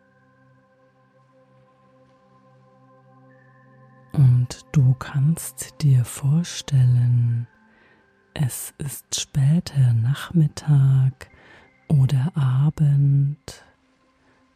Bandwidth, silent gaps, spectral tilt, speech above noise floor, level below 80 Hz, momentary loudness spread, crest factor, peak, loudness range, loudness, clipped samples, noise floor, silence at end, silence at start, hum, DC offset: 14.5 kHz; none; -6.5 dB/octave; 42 dB; -52 dBFS; 11 LU; 14 dB; -8 dBFS; 4 LU; -21 LUFS; under 0.1%; -62 dBFS; 1 s; 4.15 s; none; under 0.1%